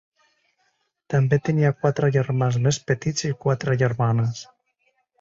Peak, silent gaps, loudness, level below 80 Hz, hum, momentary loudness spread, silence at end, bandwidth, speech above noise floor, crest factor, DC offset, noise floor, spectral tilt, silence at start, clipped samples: -6 dBFS; none; -22 LUFS; -56 dBFS; none; 5 LU; 0.75 s; 7.8 kHz; 49 dB; 16 dB; under 0.1%; -70 dBFS; -6 dB/octave; 1.1 s; under 0.1%